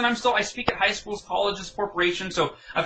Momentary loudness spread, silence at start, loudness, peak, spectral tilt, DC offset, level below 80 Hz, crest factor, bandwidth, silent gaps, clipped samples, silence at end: 7 LU; 0 s; -25 LUFS; -6 dBFS; -3 dB/octave; under 0.1%; -52 dBFS; 20 dB; 9.2 kHz; none; under 0.1%; 0 s